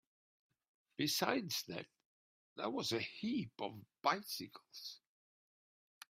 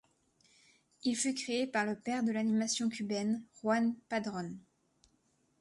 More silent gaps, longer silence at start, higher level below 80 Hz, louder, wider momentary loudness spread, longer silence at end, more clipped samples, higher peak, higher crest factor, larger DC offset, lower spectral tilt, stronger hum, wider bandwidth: first, 2.05-2.56 s vs none; about the same, 1 s vs 1.05 s; second, -84 dBFS vs -78 dBFS; second, -40 LUFS vs -34 LUFS; first, 18 LU vs 7 LU; first, 1.2 s vs 1 s; neither; about the same, -18 dBFS vs -20 dBFS; first, 26 dB vs 16 dB; neither; about the same, -3.5 dB/octave vs -4 dB/octave; neither; first, 16 kHz vs 11.5 kHz